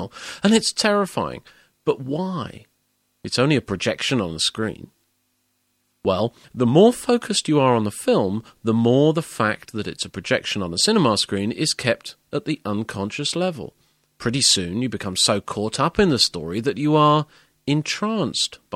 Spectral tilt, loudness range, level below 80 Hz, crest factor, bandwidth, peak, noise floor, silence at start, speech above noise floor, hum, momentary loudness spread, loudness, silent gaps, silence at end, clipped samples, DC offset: -4 dB/octave; 5 LU; -54 dBFS; 20 dB; 15.5 kHz; -2 dBFS; -69 dBFS; 0 s; 48 dB; none; 12 LU; -21 LUFS; none; 0 s; under 0.1%; under 0.1%